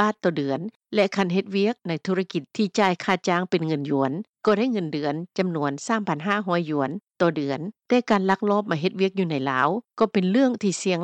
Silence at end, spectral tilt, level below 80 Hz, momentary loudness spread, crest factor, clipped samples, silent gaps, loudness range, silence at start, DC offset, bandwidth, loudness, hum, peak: 0 s; -6 dB/octave; -72 dBFS; 6 LU; 18 dB; under 0.1%; 0.76-0.80 s; 2 LU; 0 s; under 0.1%; 9 kHz; -24 LUFS; none; -6 dBFS